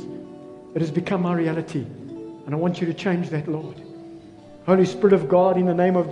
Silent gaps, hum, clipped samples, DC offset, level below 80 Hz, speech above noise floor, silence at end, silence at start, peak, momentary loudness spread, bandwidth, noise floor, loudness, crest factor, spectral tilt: none; none; under 0.1%; under 0.1%; -62 dBFS; 23 dB; 0 s; 0 s; -4 dBFS; 21 LU; 9.4 kHz; -44 dBFS; -22 LUFS; 18 dB; -8 dB/octave